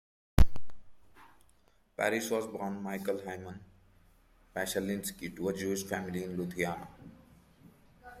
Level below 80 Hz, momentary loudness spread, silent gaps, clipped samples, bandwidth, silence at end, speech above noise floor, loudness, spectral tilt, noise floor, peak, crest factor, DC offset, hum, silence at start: -42 dBFS; 21 LU; none; under 0.1%; 16 kHz; 0 s; 33 dB; -35 LUFS; -5 dB/octave; -68 dBFS; -8 dBFS; 24 dB; under 0.1%; none; 0.35 s